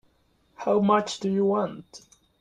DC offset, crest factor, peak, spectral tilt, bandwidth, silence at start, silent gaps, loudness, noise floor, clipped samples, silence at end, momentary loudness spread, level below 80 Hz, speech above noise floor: under 0.1%; 20 dB; -8 dBFS; -6 dB/octave; 10 kHz; 0.6 s; none; -25 LUFS; -66 dBFS; under 0.1%; 0.4 s; 12 LU; -68 dBFS; 41 dB